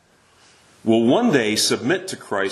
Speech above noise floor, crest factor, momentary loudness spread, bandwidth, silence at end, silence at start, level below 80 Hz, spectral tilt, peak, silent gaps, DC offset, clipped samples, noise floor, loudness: 36 dB; 18 dB; 9 LU; 13 kHz; 0 s; 0.85 s; -66 dBFS; -3.5 dB/octave; -2 dBFS; none; under 0.1%; under 0.1%; -55 dBFS; -19 LUFS